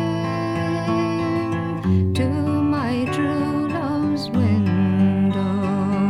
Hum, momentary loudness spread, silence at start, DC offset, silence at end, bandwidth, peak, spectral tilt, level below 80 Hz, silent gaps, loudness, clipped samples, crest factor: none; 5 LU; 0 s; under 0.1%; 0 s; 11.5 kHz; -8 dBFS; -8 dB/octave; -50 dBFS; none; -21 LUFS; under 0.1%; 12 dB